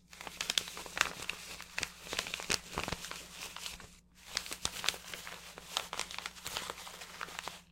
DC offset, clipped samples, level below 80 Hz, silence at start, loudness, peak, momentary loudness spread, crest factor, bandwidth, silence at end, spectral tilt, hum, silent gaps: under 0.1%; under 0.1%; -60 dBFS; 0 s; -38 LUFS; -6 dBFS; 12 LU; 36 dB; 17 kHz; 0 s; -0.5 dB/octave; none; none